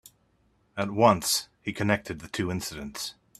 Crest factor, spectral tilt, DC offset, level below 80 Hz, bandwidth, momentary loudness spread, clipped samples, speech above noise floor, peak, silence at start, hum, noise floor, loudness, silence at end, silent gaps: 24 dB; -4 dB/octave; under 0.1%; -58 dBFS; 15.5 kHz; 14 LU; under 0.1%; 40 dB; -4 dBFS; 0.75 s; none; -67 dBFS; -27 LUFS; 0.25 s; none